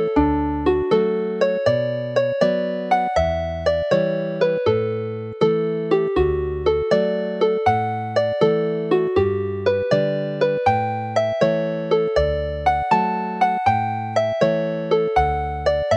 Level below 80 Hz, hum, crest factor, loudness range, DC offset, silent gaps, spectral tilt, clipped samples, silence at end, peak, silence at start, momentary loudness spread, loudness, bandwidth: -38 dBFS; none; 16 dB; 1 LU; under 0.1%; none; -7 dB/octave; under 0.1%; 0 s; -4 dBFS; 0 s; 4 LU; -20 LUFS; 9.2 kHz